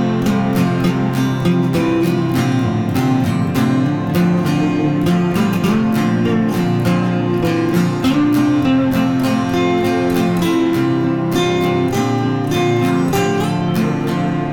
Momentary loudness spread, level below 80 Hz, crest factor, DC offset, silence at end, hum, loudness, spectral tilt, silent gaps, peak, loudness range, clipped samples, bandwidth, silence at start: 2 LU; -42 dBFS; 12 dB; under 0.1%; 0 s; none; -16 LUFS; -7 dB/octave; none; -4 dBFS; 1 LU; under 0.1%; 18 kHz; 0 s